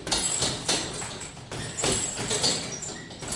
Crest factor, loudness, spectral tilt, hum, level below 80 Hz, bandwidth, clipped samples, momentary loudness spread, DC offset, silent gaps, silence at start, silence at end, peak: 20 dB; -27 LUFS; -2 dB/octave; none; -50 dBFS; 11.5 kHz; under 0.1%; 12 LU; under 0.1%; none; 0 s; 0 s; -10 dBFS